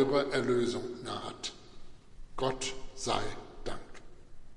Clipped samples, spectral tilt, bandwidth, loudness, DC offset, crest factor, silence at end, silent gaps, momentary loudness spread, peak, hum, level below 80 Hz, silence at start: under 0.1%; -4 dB/octave; 11.5 kHz; -34 LUFS; under 0.1%; 20 dB; 0 s; none; 18 LU; -14 dBFS; none; -48 dBFS; 0 s